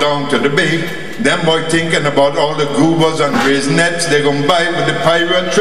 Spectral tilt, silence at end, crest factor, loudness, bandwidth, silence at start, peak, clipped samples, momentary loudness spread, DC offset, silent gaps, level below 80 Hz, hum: -4.5 dB/octave; 0 s; 14 dB; -13 LUFS; 15.5 kHz; 0 s; 0 dBFS; under 0.1%; 3 LU; 5%; none; -50 dBFS; none